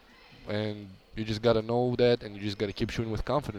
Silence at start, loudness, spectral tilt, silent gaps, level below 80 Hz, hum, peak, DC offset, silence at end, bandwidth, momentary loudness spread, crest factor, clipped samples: 0.3 s; -30 LUFS; -6.5 dB/octave; none; -48 dBFS; none; -12 dBFS; under 0.1%; 0 s; 13.5 kHz; 13 LU; 18 dB; under 0.1%